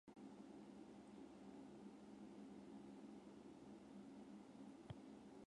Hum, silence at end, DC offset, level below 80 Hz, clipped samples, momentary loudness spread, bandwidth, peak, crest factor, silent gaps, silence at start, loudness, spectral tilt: none; 0 s; under 0.1%; -82 dBFS; under 0.1%; 2 LU; 11 kHz; -42 dBFS; 18 dB; none; 0.05 s; -60 LUFS; -6.5 dB/octave